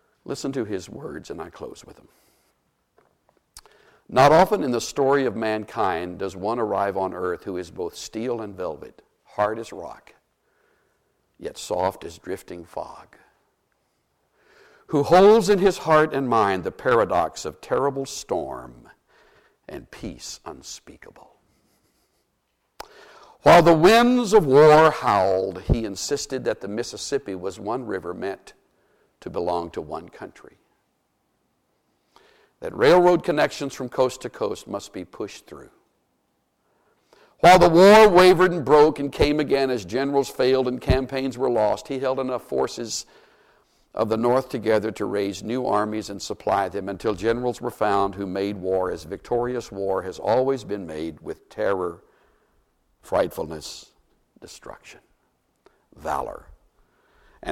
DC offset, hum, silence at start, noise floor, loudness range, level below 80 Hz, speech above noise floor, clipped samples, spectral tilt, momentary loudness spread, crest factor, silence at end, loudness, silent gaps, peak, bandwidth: under 0.1%; none; 0.3 s; -72 dBFS; 18 LU; -44 dBFS; 51 dB; under 0.1%; -5 dB/octave; 22 LU; 20 dB; 0 s; -21 LUFS; none; -2 dBFS; 16.5 kHz